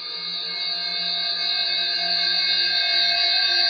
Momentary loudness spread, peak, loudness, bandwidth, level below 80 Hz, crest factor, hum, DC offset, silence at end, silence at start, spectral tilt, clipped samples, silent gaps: 7 LU; -8 dBFS; -20 LUFS; 12 kHz; -66 dBFS; 14 dB; none; under 0.1%; 0 s; 0 s; -0.5 dB/octave; under 0.1%; none